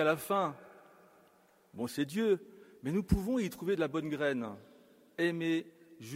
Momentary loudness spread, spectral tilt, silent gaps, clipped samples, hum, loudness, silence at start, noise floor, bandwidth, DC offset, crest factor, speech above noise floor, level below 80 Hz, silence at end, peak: 19 LU; -6 dB/octave; none; under 0.1%; none; -34 LUFS; 0 s; -66 dBFS; 16 kHz; under 0.1%; 20 dB; 33 dB; -52 dBFS; 0 s; -14 dBFS